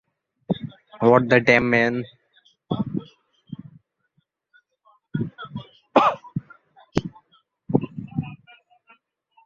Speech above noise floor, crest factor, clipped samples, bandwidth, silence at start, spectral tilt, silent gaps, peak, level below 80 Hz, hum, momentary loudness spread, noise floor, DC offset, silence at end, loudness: 53 dB; 24 dB; under 0.1%; 7.6 kHz; 0.5 s; -7 dB/octave; none; -2 dBFS; -54 dBFS; none; 23 LU; -70 dBFS; under 0.1%; 1.1 s; -22 LUFS